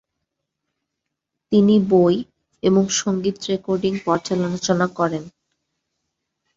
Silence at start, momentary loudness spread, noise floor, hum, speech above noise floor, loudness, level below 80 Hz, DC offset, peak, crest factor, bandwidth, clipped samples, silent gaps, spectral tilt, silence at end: 1.5 s; 9 LU; -80 dBFS; none; 62 dB; -19 LUFS; -58 dBFS; under 0.1%; -4 dBFS; 18 dB; 7.8 kHz; under 0.1%; none; -5.5 dB/octave; 1.25 s